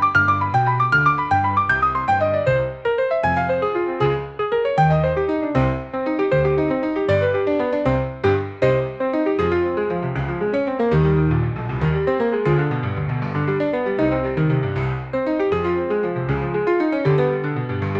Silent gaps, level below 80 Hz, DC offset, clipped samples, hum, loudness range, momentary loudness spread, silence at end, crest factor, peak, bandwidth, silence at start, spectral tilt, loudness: none; -40 dBFS; 0.1%; under 0.1%; none; 2 LU; 6 LU; 0 s; 16 dB; -4 dBFS; 7.6 kHz; 0 s; -8.5 dB/octave; -20 LUFS